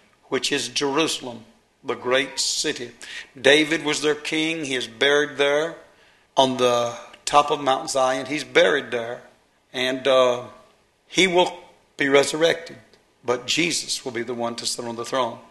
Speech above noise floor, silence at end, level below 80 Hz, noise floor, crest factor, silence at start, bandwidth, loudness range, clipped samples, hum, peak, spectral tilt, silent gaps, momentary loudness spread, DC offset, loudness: 35 dB; 0.1 s; -64 dBFS; -57 dBFS; 22 dB; 0.3 s; 12.5 kHz; 2 LU; under 0.1%; none; -2 dBFS; -2.5 dB/octave; none; 12 LU; under 0.1%; -22 LUFS